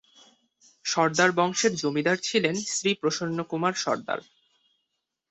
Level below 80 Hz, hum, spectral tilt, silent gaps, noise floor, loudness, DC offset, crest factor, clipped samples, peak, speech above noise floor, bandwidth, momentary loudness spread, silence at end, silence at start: -70 dBFS; none; -3.5 dB/octave; none; -81 dBFS; -25 LUFS; under 0.1%; 20 dB; under 0.1%; -8 dBFS; 55 dB; 8.4 kHz; 8 LU; 1.1 s; 0.85 s